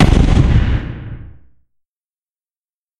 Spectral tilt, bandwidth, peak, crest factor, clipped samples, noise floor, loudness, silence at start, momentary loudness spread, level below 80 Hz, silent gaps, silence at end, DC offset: -7.5 dB/octave; 10.5 kHz; 0 dBFS; 16 dB; under 0.1%; under -90 dBFS; -14 LUFS; 0 s; 20 LU; -18 dBFS; none; 1.75 s; under 0.1%